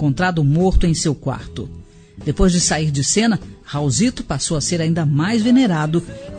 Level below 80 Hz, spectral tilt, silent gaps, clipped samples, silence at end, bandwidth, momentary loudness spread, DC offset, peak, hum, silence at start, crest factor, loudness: -30 dBFS; -5 dB/octave; none; under 0.1%; 0 s; 9.4 kHz; 12 LU; under 0.1%; -2 dBFS; none; 0 s; 16 dB; -18 LUFS